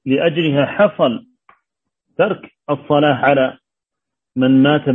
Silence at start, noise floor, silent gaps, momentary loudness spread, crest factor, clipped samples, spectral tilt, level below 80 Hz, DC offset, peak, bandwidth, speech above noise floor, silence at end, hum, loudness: 0.05 s; -83 dBFS; none; 13 LU; 16 dB; under 0.1%; -9.5 dB/octave; -60 dBFS; under 0.1%; 0 dBFS; 3.9 kHz; 68 dB; 0 s; none; -16 LUFS